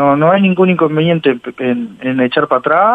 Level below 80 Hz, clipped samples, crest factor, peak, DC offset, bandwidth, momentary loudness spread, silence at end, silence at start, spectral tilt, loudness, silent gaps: -56 dBFS; under 0.1%; 12 dB; 0 dBFS; under 0.1%; 4.7 kHz; 8 LU; 0 s; 0 s; -9 dB/octave; -13 LUFS; none